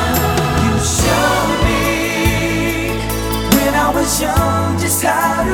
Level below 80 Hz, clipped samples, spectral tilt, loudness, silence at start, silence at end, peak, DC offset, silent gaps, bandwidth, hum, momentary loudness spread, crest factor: -26 dBFS; under 0.1%; -4 dB/octave; -15 LUFS; 0 s; 0 s; 0 dBFS; under 0.1%; none; over 20 kHz; none; 4 LU; 14 dB